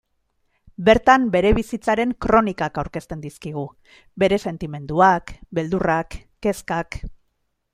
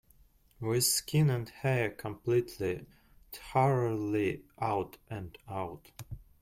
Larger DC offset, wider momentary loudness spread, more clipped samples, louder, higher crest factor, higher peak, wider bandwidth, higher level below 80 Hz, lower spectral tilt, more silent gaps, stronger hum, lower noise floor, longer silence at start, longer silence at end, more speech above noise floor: neither; about the same, 16 LU vs 18 LU; neither; first, -20 LUFS vs -32 LUFS; about the same, 20 dB vs 18 dB; first, -2 dBFS vs -14 dBFS; about the same, 15 kHz vs 16.5 kHz; first, -38 dBFS vs -60 dBFS; about the same, -6 dB/octave vs -5 dB/octave; neither; neither; first, -71 dBFS vs -63 dBFS; first, 0.8 s vs 0.6 s; first, 0.6 s vs 0.25 s; first, 51 dB vs 31 dB